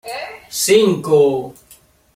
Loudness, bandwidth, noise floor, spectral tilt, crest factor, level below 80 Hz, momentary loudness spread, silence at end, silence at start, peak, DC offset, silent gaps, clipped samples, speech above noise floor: -15 LUFS; 16 kHz; -49 dBFS; -4 dB/octave; 16 dB; -58 dBFS; 16 LU; 0.65 s; 0.05 s; -2 dBFS; under 0.1%; none; under 0.1%; 35 dB